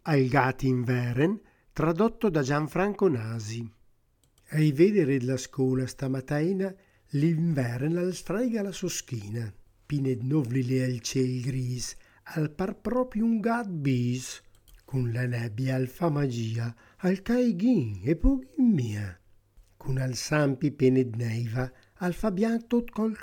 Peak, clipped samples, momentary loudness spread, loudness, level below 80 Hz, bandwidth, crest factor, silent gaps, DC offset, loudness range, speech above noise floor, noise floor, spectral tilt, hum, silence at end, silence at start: -8 dBFS; under 0.1%; 10 LU; -28 LUFS; -46 dBFS; 17.5 kHz; 20 dB; none; under 0.1%; 3 LU; 39 dB; -66 dBFS; -6.5 dB/octave; none; 0 s; 0.05 s